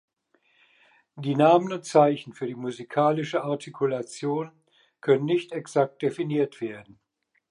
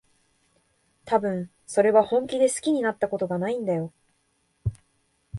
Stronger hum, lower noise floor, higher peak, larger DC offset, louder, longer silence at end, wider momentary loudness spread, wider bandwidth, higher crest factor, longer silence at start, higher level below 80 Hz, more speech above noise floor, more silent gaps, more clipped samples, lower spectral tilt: neither; about the same, -68 dBFS vs -70 dBFS; about the same, -6 dBFS vs -6 dBFS; neither; about the same, -25 LUFS vs -25 LUFS; first, 0.7 s vs 0 s; about the same, 14 LU vs 14 LU; about the same, 11.5 kHz vs 11.5 kHz; about the same, 20 dB vs 20 dB; about the same, 1.15 s vs 1.05 s; second, -78 dBFS vs -52 dBFS; about the same, 43 dB vs 46 dB; neither; neither; about the same, -6.5 dB/octave vs -5.5 dB/octave